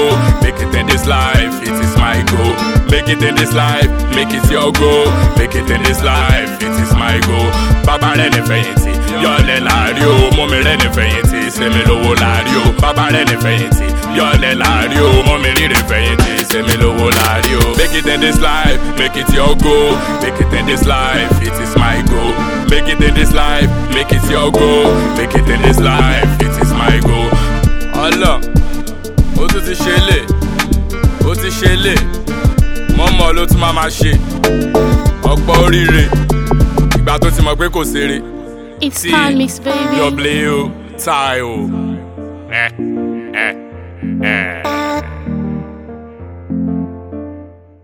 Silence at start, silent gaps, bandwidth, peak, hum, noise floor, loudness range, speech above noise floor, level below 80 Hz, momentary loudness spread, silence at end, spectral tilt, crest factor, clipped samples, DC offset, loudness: 0 s; none; over 20 kHz; 0 dBFS; none; -34 dBFS; 6 LU; 23 dB; -16 dBFS; 8 LU; 0.35 s; -5 dB/octave; 12 dB; under 0.1%; 0.2%; -12 LUFS